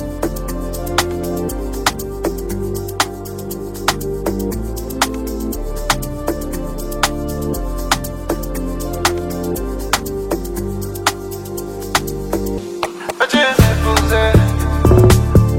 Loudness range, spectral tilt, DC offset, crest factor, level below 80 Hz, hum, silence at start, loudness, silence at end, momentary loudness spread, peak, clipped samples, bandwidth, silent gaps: 6 LU; -5 dB/octave; under 0.1%; 18 dB; -24 dBFS; none; 0 s; -18 LUFS; 0 s; 12 LU; 0 dBFS; under 0.1%; 16.5 kHz; none